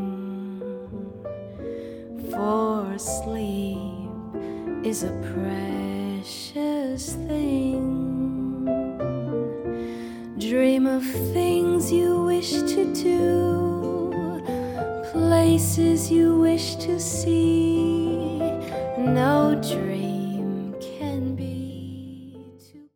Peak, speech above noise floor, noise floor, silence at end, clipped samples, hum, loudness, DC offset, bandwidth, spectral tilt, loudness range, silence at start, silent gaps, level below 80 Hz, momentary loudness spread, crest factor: -8 dBFS; 26 dB; -48 dBFS; 0.1 s; under 0.1%; none; -24 LUFS; under 0.1%; 19 kHz; -6 dB/octave; 8 LU; 0 s; none; -50 dBFS; 15 LU; 16 dB